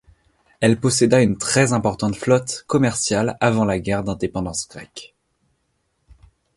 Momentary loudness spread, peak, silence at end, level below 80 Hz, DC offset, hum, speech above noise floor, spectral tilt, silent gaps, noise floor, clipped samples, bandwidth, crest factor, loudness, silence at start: 11 LU; -2 dBFS; 1.5 s; -46 dBFS; under 0.1%; none; 50 dB; -5 dB/octave; none; -69 dBFS; under 0.1%; 11.5 kHz; 20 dB; -19 LUFS; 0.6 s